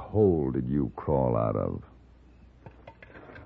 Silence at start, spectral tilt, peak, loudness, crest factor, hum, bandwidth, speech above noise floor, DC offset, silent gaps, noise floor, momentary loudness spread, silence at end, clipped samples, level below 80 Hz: 0 s; -12.5 dB/octave; -10 dBFS; -27 LUFS; 18 dB; none; 4.3 kHz; 28 dB; under 0.1%; none; -54 dBFS; 23 LU; 0 s; under 0.1%; -46 dBFS